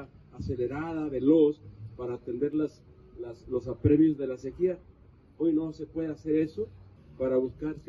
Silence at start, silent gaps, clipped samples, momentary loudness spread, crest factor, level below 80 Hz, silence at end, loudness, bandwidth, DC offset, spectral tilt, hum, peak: 0 s; none; under 0.1%; 18 LU; 18 dB; -52 dBFS; 0.05 s; -29 LUFS; 6.2 kHz; under 0.1%; -9.5 dB/octave; none; -12 dBFS